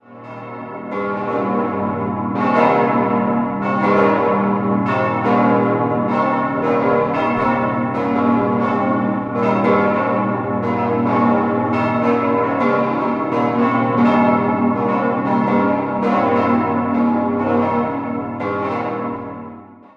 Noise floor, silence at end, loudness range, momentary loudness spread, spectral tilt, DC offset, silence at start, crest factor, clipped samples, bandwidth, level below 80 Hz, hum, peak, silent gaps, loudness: -37 dBFS; 0.25 s; 2 LU; 8 LU; -9 dB/octave; under 0.1%; 0.1 s; 16 dB; under 0.1%; 6.4 kHz; -50 dBFS; none; -2 dBFS; none; -17 LUFS